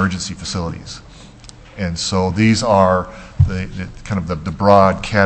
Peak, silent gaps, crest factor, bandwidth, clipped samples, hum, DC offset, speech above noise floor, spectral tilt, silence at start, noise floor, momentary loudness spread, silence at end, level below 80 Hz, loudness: 0 dBFS; none; 16 dB; 8.6 kHz; under 0.1%; none; under 0.1%; 23 dB; -5.5 dB/octave; 0 s; -40 dBFS; 18 LU; 0 s; -34 dBFS; -17 LUFS